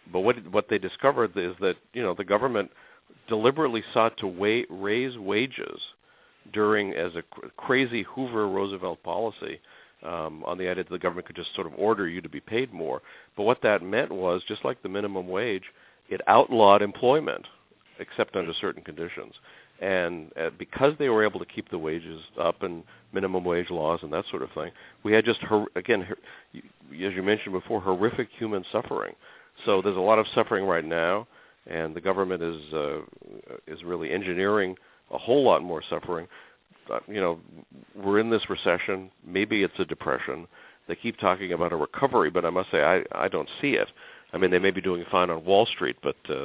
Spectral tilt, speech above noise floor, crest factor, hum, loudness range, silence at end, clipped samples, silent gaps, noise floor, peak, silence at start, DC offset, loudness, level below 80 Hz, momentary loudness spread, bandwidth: -9 dB/octave; 33 dB; 24 dB; none; 6 LU; 0 s; under 0.1%; none; -60 dBFS; -2 dBFS; 0.05 s; under 0.1%; -27 LUFS; -60 dBFS; 14 LU; 4 kHz